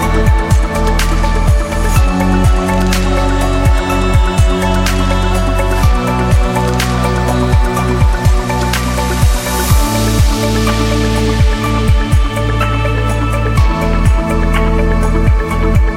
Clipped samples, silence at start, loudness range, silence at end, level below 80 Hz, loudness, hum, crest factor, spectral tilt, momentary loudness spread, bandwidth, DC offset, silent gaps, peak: under 0.1%; 0 s; 1 LU; 0 s; -14 dBFS; -13 LUFS; none; 10 dB; -5.5 dB/octave; 2 LU; 16.5 kHz; 0.2%; none; 0 dBFS